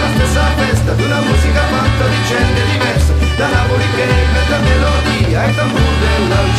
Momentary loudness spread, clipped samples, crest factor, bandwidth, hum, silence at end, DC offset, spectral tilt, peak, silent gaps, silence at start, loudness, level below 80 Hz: 1 LU; under 0.1%; 12 dB; 14 kHz; none; 0 s; under 0.1%; -5.5 dB/octave; 0 dBFS; none; 0 s; -13 LUFS; -18 dBFS